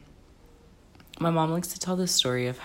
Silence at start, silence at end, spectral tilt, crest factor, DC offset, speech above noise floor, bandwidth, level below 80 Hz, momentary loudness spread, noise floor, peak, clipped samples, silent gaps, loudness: 1.15 s; 0 s; -4 dB/octave; 20 dB; under 0.1%; 28 dB; 16.5 kHz; -58 dBFS; 7 LU; -54 dBFS; -10 dBFS; under 0.1%; none; -26 LUFS